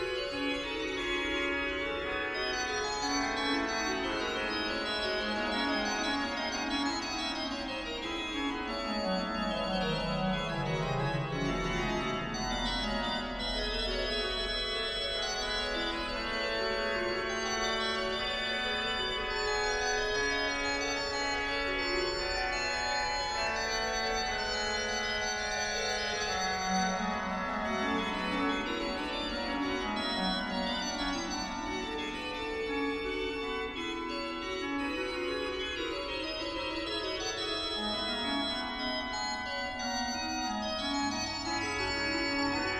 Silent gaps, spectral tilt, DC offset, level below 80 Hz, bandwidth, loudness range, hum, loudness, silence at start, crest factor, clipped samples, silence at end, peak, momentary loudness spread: none; -3 dB/octave; under 0.1%; -48 dBFS; 14 kHz; 3 LU; none; -32 LUFS; 0 s; 14 dB; under 0.1%; 0 s; -18 dBFS; 4 LU